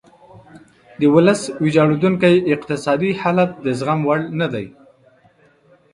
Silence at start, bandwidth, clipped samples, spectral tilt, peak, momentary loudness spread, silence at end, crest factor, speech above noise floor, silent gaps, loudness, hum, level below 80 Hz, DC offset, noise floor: 0.55 s; 11.5 kHz; under 0.1%; -6.5 dB/octave; 0 dBFS; 8 LU; 1.25 s; 18 dB; 38 dB; none; -17 LUFS; none; -56 dBFS; under 0.1%; -54 dBFS